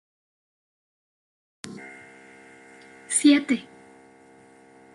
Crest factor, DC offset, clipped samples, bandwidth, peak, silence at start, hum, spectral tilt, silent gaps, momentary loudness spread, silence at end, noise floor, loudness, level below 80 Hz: 22 dB; under 0.1%; under 0.1%; 11.5 kHz; -6 dBFS; 1.65 s; none; -2 dB/octave; none; 25 LU; 1.35 s; -53 dBFS; -21 LUFS; -78 dBFS